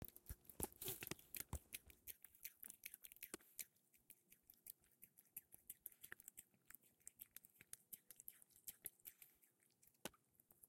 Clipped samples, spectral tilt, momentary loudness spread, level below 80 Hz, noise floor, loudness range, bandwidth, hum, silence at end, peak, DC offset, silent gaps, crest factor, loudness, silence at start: under 0.1%; -2.5 dB/octave; 14 LU; -72 dBFS; -79 dBFS; 7 LU; 16.5 kHz; none; 0 s; -26 dBFS; under 0.1%; none; 34 dB; -56 LUFS; 0 s